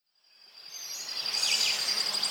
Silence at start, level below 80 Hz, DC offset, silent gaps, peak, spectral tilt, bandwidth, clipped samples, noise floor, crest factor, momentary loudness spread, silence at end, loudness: 0.55 s; -88 dBFS; under 0.1%; none; -14 dBFS; 2.5 dB/octave; 17.5 kHz; under 0.1%; -60 dBFS; 18 dB; 17 LU; 0 s; -27 LUFS